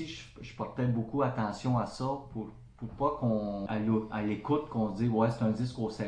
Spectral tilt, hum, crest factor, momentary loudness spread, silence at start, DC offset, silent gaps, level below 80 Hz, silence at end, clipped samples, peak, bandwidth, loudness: -8 dB/octave; none; 16 dB; 13 LU; 0 s; under 0.1%; none; -56 dBFS; 0 s; under 0.1%; -16 dBFS; 9.8 kHz; -32 LUFS